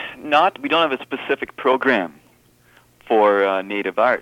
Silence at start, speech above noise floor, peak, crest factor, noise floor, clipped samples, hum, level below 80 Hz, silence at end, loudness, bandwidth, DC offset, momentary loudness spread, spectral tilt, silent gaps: 0 s; 36 dB; -4 dBFS; 16 dB; -55 dBFS; under 0.1%; none; -64 dBFS; 0 s; -19 LUFS; 16 kHz; under 0.1%; 8 LU; -5 dB/octave; none